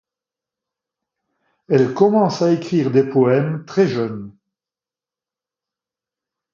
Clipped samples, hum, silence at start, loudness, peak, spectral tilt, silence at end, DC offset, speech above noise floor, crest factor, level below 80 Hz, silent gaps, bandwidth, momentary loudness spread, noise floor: under 0.1%; none; 1.7 s; -17 LUFS; 0 dBFS; -7.5 dB/octave; 2.25 s; under 0.1%; over 74 dB; 20 dB; -64 dBFS; none; 7.4 kHz; 8 LU; under -90 dBFS